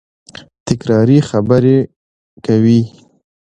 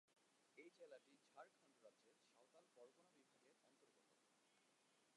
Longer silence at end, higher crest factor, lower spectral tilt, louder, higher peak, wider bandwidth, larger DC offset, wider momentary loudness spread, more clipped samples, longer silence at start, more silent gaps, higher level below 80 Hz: first, 0.55 s vs 0 s; second, 14 dB vs 22 dB; first, -8 dB/octave vs -2.5 dB/octave; first, -13 LUFS vs -67 LUFS; first, 0 dBFS vs -50 dBFS; second, 9.2 kHz vs 11 kHz; neither; first, 15 LU vs 3 LU; neither; first, 0.65 s vs 0.05 s; first, 1.96-2.37 s vs none; first, -46 dBFS vs under -90 dBFS